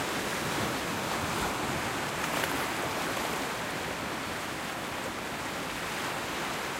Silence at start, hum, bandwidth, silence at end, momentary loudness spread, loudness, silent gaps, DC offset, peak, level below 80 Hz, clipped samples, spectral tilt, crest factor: 0 s; none; 16 kHz; 0 s; 4 LU; -32 LUFS; none; under 0.1%; -12 dBFS; -54 dBFS; under 0.1%; -3 dB/octave; 22 dB